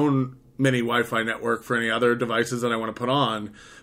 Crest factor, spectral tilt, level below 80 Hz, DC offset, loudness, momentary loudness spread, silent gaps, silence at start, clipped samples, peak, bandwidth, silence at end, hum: 16 dB; -5.5 dB/octave; -62 dBFS; under 0.1%; -24 LUFS; 5 LU; none; 0 s; under 0.1%; -8 dBFS; 16 kHz; 0.05 s; none